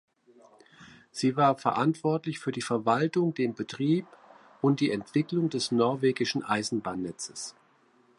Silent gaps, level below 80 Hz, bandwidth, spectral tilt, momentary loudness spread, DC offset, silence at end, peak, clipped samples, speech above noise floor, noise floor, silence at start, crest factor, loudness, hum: none; -70 dBFS; 11.5 kHz; -5.5 dB/octave; 10 LU; under 0.1%; 0.65 s; -10 dBFS; under 0.1%; 36 dB; -64 dBFS; 0.8 s; 20 dB; -28 LUFS; none